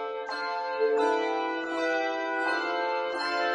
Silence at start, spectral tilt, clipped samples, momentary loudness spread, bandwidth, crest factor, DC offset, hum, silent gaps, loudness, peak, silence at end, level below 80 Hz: 0 s; -2.5 dB/octave; under 0.1%; 6 LU; 10.5 kHz; 14 dB; under 0.1%; none; none; -28 LUFS; -14 dBFS; 0 s; -74 dBFS